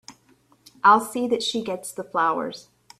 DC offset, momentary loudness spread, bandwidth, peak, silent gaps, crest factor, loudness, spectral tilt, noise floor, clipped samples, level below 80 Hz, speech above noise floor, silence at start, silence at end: under 0.1%; 14 LU; 15 kHz; -2 dBFS; none; 22 dB; -22 LUFS; -3 dB/octave; -60 dBFS; under 0.1%; -70 dBFS; 38 dB; 0.1 s; 0.4 s